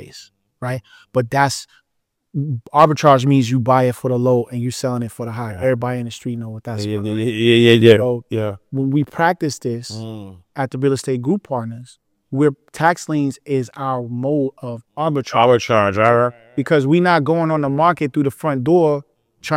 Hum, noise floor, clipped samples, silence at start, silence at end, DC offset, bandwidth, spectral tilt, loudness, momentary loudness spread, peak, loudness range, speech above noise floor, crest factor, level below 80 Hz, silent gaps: none; -74 dBFS; under 0.1%; 0 s; 0 s; under 0.1%; 16 kHz; -6.5 dB/octave; -17 LUFS; 14 LU; 0 dBFS; 5 LU; 57 dB; 18 dB; -58 dBFS; none